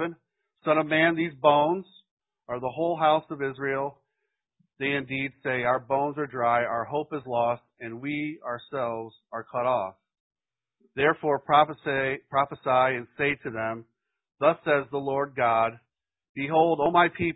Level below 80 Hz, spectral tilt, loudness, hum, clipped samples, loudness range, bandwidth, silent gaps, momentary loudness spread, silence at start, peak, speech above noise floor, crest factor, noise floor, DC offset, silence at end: -64 dBFS; -10 dB/octave; -26 LUFS; none; under 0.1%; 5 LU; 4 kHz; 2.11-2.17 s, 10.20-10.30 s, 16.29-16.35 s; 12 LU; 0 s; -6 dBFS; 56 dB; 20 dB; -82 dBFS; under 0.1%; 0 s